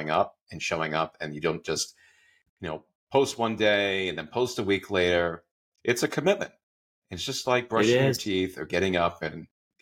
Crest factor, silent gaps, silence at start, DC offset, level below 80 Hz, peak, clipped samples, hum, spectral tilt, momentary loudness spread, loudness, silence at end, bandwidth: 18 dB; 0.41-0.47 s, 2.49-2.57 s, 2.95-3.07 s, 5.51-5.72 s, 6.63-7.02 s; 0 s; under 0.1%; -60 dBFS; -8 dBFS; under 0.1%; none; -4 dB/octave; 13 LU; -27 LUFS; 0.35 s; 17 kHz